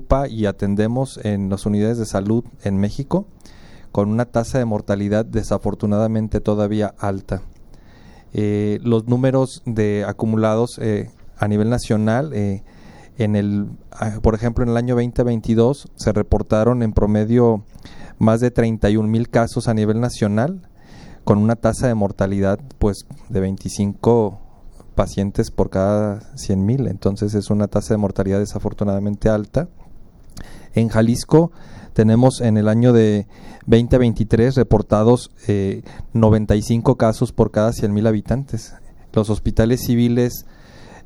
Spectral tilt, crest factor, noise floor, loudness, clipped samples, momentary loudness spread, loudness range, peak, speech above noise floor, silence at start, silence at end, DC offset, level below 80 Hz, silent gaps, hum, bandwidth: -7.5 dB/octave; 18 dB; -43 dBFS; -19 LUFS; under 0.1%; 9 LU; 5 LU; 0 dBFS; 25 dB; 0 s; 0.05 s; under 0.1%; -34 dBFS; none; none; 12.5 kHz